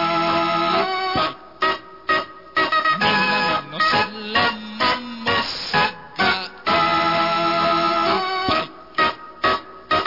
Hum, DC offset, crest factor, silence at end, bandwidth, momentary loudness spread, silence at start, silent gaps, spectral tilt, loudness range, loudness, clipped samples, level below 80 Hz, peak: none; 0.3%; 14 dB; 0 s; 5.8 kHz; 5 LU; 0 s; none; -4.5 dB/octave; 1 LU; -20 LUFS; under 0.1%; -52 dBFS; -6 dBFS